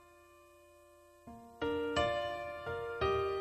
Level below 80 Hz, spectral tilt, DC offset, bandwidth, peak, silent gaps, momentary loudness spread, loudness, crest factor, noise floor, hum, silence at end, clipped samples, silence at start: -58 dBFS; -5.5 dB/octave; under 0.1%; 13.5 kHz; -20 dBFS; none; 21 LU; -36 LUFS; 18 dB; -61 dBFS; none; 0 s; under 0.1%; 0 s